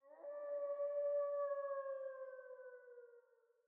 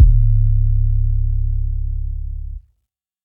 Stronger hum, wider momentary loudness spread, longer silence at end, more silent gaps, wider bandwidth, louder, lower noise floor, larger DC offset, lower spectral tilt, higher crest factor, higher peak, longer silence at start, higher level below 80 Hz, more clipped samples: neither; first, 18 LU vs 15 LU; second, 0.45 s vs 0.65 s; neither; first, 2.4 kHz vs 0.3 kHz; second, -44 LUFS vs -20 LUFS; about the same, -72 dBFS vs -74 dBFS; neither; second, 8 dB/octave vs -13.5 dB/octave; about the same, 12 dB vs 14 dB; second, -34 dBFS vs 0 dBFS; about the same, 0.05 s vs 0 s; second, under -90 dBFS vs -16 dBFS; neither